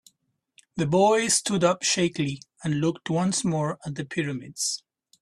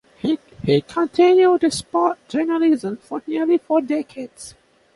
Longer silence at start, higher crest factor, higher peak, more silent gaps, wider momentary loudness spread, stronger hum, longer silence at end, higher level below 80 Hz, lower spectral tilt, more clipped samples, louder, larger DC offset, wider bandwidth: first, 0.75 s vs 0.25 s; about the same, 20 dB vs 16 dB; about the same, -6 dBFS vs -4 dBFS; neither; second, 11 LU vs 17 LU; neither; about the same, 0.45 s vs 0.45 s; second, -62 dBFS vs -56 dBFS; second, -4 dB/octave vs -5.5 dB/octave; neither; second, -25 LUFS vs -19 LUFS; neither; first, 14.5 kHz vs 11.5 kHz